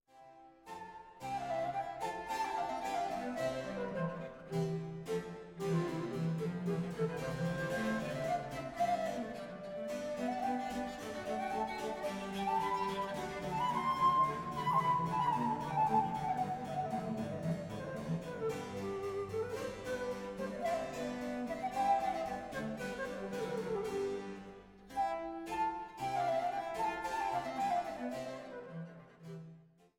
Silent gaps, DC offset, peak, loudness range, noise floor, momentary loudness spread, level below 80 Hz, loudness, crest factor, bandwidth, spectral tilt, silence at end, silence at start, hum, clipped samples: none; under 0.1%; -20 dBFS; 6 LU; -59 dBFS; 11 LU; -64 dBFS; -38 LUFS; 18 dB; 17.5 kHz; -6 dB/octave; 0.4 s; 0.15 s; none; under 0.1%